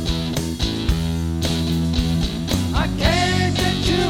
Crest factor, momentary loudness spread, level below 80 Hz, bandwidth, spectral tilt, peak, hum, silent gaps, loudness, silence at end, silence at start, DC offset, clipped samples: 16 dB; 5 LU; -28 dBFS; 17 kHz; -5 dB/octave; -4 dBFS; none; none; -20 LUFS; 0 s; 0 s; under 0.1%; under 0.1%